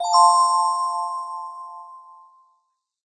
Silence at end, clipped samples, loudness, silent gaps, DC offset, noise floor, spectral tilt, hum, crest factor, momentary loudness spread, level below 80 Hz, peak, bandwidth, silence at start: 1.05 s; under 0.1%; -19 LUFS; none; under 0.1%; -71 dBFS; 4.5 dB/octave; none; 18 dB; 23 LU; under -90 dBFS; -4 dBFS; 9.4 kHz; 0 s